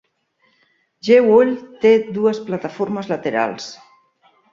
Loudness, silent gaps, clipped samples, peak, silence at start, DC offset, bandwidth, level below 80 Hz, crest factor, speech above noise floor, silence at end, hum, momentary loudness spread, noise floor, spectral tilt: -17 LUFS; none; under 0.1%; -2 dBFS; 1.05 s; under 0.1%; 7.4 kHz; -64 dBFS; 18 dB; 47 dB; 0.8 s; none; 14 LU; -63 dBFS; -6 dB/octave